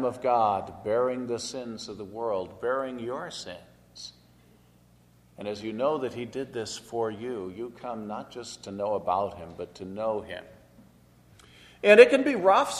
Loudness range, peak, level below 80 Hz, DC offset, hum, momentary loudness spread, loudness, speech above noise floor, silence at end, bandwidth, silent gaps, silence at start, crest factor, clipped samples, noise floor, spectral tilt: 11 LU; -2 dBFS; -64 dBFS; under 0.1%; 60 Hz at -60 dBFS; 18 LU; -27 LUFS; 32 dB; 0 s; 12.5 kHz; none; 0 s; 26 dB; under 0.1%; -59 dBFS; -4.5 dB/octave